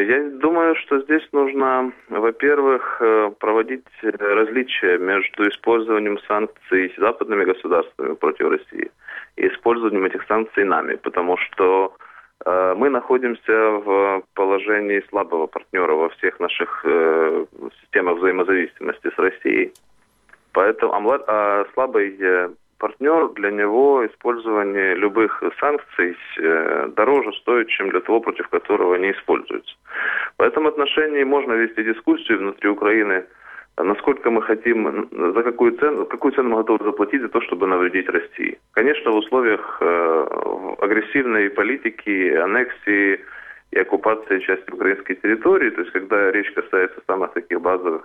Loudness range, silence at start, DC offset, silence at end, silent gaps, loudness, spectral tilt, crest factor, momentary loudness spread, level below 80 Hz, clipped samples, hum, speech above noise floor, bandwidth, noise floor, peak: 2 LU; 0 s; under 0.1%; 0 s; none; -19 LUFS; -7 dB/octave; 18 dB; 6 LU; -64 dBFS; under 0.1%; none; 35 dB; 3.9 kHz; -54 dBFS; -2 dBFS